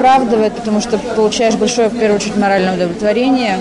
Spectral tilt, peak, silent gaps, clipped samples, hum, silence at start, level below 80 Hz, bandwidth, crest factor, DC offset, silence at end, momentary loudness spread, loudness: -4.5 dB/octave; -2 dBFS; none; under 0.1%; none; 0 s; -44 dBFS; 11 kHz; 10 dB; under 0.1%; 0 s; 4 LU; -14 LUFS